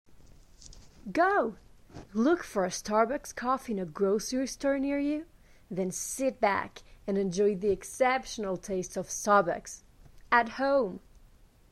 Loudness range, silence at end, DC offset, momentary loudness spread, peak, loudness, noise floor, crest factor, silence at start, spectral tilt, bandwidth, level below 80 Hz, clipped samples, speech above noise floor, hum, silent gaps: 2 LU; 0.75 s; under 0.1%; 11 LU; -10 dBFS; -30 LUFS; -58 dBFS; 20 dB; 0.1 s; -4.5 dB/octave; 14 kHz; -56 dBFS; under 0.1%; 29 dB; none; none